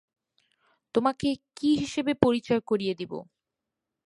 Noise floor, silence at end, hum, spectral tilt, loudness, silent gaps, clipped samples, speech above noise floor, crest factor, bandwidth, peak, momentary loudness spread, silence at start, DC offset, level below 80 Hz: -87 dBFS; 0.85 s; none; -6 dB/octave; -27 LUFS; none; under 0.1%; 60 dB; 26 dB; 11.5 kHz; -2 dBFS; 9 LU; 0.95 s; under 0.1%; -58 dBFS